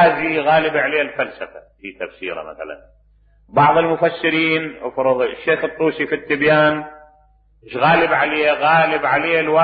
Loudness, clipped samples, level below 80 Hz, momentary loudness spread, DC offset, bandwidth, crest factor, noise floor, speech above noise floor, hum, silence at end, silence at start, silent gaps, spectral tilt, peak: -17 LUFS; under 0.1%; -52 dBFS; 17 LU; under 0.1%; 5 kHz; 16 dB; -54 dBFS; 36 dB; none; 0 s; 0 s; none; -10 dB/octave; -2 dBFS